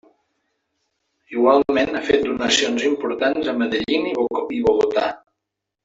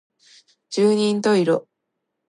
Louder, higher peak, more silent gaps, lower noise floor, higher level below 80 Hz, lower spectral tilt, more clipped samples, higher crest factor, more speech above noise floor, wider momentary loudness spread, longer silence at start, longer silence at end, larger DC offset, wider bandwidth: about the same, -20 LUFS vs -20 LUFS; first, -2 dBFS vs -6 dBFS; neither; about the same, -81 dBFS vs -78 dBFS; first, -54 dBFS vs -72 dBFS; second, -3 dB/octave vs -5.5 dB/octave; neither; about the same, 20 dB vs 16 dB; about the same, 62 dB vs 59 dB; about the same, 6 LU vs 7 LU; first, 1.3 s vs 0.7 s; about the same, 0.65 s vs 0.7 s; neither; second, 8 kHz vs 11 kHz